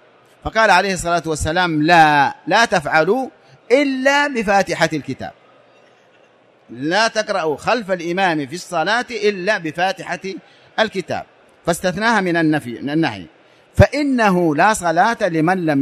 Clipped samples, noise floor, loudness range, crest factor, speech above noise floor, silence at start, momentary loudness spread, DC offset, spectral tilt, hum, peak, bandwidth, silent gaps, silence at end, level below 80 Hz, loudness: under 0.1%; -52 dBFS; 6 LU; 18 dB; 35 dB; 0.45 s; 13 LU; under 0.1%; -5 dB/octave; none; 0 dBFS; 14.5 kHz; none; 0 s; -42 dBFS; -17 LUFS